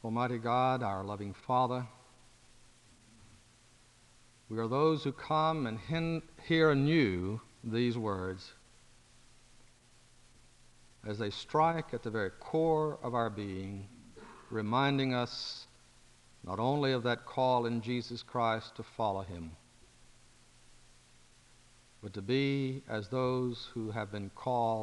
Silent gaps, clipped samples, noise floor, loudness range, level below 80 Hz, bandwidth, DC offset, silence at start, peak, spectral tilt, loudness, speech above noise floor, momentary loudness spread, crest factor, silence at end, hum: none; under 0.1%; -63 dBFS; 9 LU; -64 dBFS; 11.5 kHz; under 0.1%; 0.05 s; -14 dBFS; -7 dB/octave; -33 LUFS; 30 dB; 15 LU; 20 dB; 0 s; none